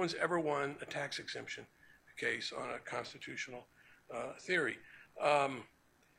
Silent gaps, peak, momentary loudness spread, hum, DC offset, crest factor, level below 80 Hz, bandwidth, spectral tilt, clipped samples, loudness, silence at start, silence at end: none; -16 dBFS; 15 LU; none; under 0.1%; 22 dB; -78 dBFS; 15 kHz; -4 dB/octave; under 0.1%; -38 LUFS; 0 s; 0.5 s